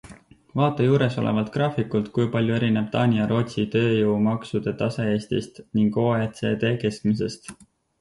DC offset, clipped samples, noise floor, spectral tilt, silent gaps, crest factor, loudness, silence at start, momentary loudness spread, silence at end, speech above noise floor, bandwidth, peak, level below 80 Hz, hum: under 0.1%; under 0.1%; -47 dBFS; -7.5 dB/octave; none; 16 dB; -23 LUFS; 0.05 s; 7 LU; 0.45 s; 25 dB; 11.5 kHz; -8 dBFS; -56 dBFS; none